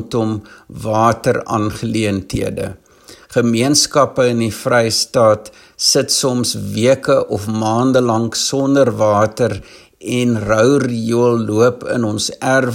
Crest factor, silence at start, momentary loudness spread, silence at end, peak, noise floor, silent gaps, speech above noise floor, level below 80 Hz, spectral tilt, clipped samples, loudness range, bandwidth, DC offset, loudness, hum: 16 dB; 0 s; 8 LU; 0 s; 0 dBFS; -43 dBFS; none; 27 dB; -46 dBFS; -4.5 dB/octave; under 0.1%; 3 LU; 16.5 kHz; under 0.1%; -15 LUFS; none